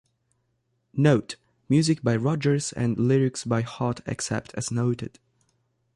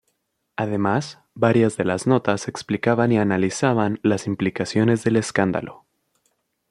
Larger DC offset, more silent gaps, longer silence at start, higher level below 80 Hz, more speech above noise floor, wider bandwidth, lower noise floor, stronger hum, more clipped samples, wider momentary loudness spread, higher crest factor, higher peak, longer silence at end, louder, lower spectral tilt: neither; neither; first, 0.95 s vs 0.6 s; about the same, -58 dBFS vs -60 dBFS; about the same, 49 dB vs 52 dB; about the same, 11.5 kHz vs 11.5 kHz; about the same, -73 dBFS vs -72 dBFS; neither; neither; about the same, 10 LU vs 8 LU; about the same, 18 dB vs 20 dB; second, -6 dBFS vs -2 dBFS; about the same, 0.85 s vs 0.95 s; second, -25 LUFS vs -21 LUFS; about the same, -6 dB/octave vs -6 dB/octave